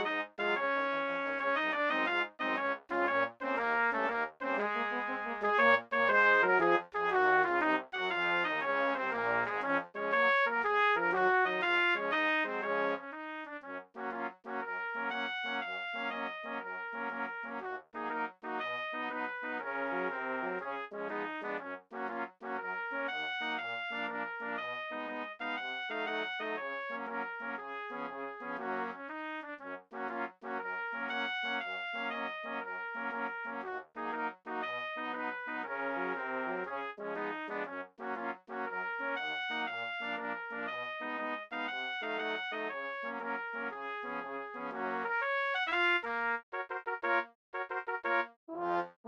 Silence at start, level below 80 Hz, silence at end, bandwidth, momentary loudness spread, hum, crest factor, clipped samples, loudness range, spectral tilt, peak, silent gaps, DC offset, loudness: 0 s; -76 dBFS; 0 s; 8 kHz; 12 LU; none; 22 dB; under 0.1%; 9 LU; -5 dB/octave; -14 dBFS; 46.43-46.52 s, 47.35-47.53 s, 48.36-48.47 s, 48.96-49.04 s; under 0.1%; -34 LUFS